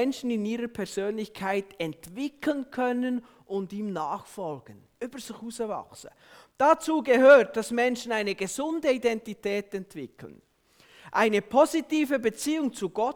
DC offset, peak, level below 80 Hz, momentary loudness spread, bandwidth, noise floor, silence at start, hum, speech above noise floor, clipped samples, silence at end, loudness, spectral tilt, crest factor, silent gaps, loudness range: under 0.1%; -6 dBFS; -66 dBFS; 15 LU; 18.5 kHz; -59 dBFS; 0 s; none; 33 dB; under 0.1%; 0 s; -26 LUFS; -4.5 dB/octave; 20 dB; none; 10 LU